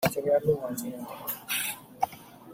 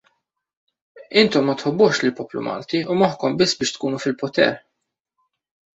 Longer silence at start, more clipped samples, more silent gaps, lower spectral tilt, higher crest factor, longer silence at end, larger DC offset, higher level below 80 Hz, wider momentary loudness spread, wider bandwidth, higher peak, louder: second, 0 s vs 0.95 s; neither; neither; about the same, -4 dB/octave vs -4.5 dB/octave; about the same, 20 dB vs 20 dB; second, 0 s vs 1.15 s; neither; about the same, -64 dBFS vs -62 dBFS; first, 11 LU vs 8 LU; first, 16.5 kHz vs 8.4 kHz; second, -10 dBFS vs -2 dBFS; second, -30 LUFS vs -20 LUFS